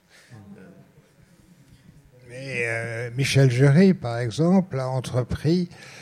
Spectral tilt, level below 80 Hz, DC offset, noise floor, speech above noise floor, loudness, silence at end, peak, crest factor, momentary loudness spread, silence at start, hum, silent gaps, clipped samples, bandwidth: -6.5 dB/octave; -50 dBFS; under 0.1%; -55 dBFS; 34 dB; -22 LUFS; 0 s; -6 dBFS; 18 dB; 14 LU; 0.3 s; none; none; under 0.1%; 13.5 kHz